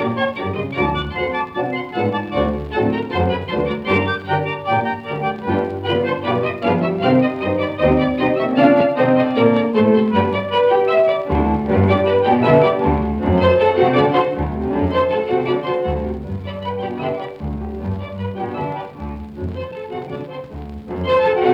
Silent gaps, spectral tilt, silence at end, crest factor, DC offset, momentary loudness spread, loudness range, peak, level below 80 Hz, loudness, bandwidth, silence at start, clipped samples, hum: none; -8.5 dB/octave; 0 s; 18 dB; under 0.1%; 13 LU; 11 LU; 0 dBFS; -36 dBFS; -18 LUFS; 6 kHz; 0 s; under 0.1%; none